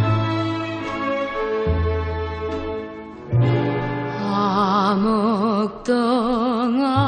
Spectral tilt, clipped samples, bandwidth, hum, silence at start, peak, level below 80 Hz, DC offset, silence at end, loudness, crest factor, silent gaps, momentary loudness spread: -7.5 dB/octave; under 0.1%; 9.4 kHz; none; 0 s; -6 dBFS; -36 dBFS; under 0.1%; 0 s; -21 LUFS; 14 dB; none; 8 LU